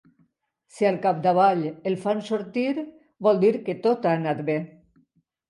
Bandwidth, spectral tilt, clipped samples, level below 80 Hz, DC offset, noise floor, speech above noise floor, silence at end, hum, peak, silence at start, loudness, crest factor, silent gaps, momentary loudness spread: 11.5 kHz; -7.5 dB/octave; under 0.1%; -74 dBFS; under 0.1%; -67 dBFS; 45 dB; 0.85 s; none; -8 dBFS; 0.75 s; -24 LUFS; 18 dB; none; 8 LU